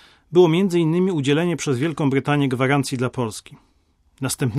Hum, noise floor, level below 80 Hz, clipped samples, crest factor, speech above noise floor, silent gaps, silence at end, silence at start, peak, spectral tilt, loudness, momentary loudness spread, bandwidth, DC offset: none; -61 dBFS; -58 dBFS; under 0.1%; 16 dB; 42 dB; none; 0 s; 0.3 s; -4 dBFS; -6 dB/octave; -20 LUFS; 11 LU; 14.5 kHz; under 0.1%